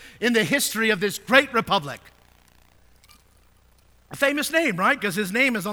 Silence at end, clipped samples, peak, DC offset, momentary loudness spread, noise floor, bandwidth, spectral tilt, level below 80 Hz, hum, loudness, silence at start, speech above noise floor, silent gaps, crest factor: 0 s; under 0.1%; 0 dBFS; under 0.1%; 7 LU; -57 dBFS; over 20 kHz; -3 dB/octave; -60 dBFS; none; -21 LUFS; 0 s; 35 dB; none; 24 dB